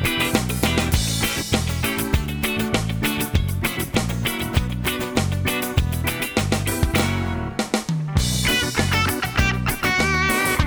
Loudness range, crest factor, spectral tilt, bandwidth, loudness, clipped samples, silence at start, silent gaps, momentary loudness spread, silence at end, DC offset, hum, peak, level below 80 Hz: 2 LU; 16 dB; -4 dB/octave; over 20 kHz; -21 LUFS; under 0.1%; 0 s; none; 5 LU; 0 s; under 0.1%; none; -4 dBFS; -30 dBFS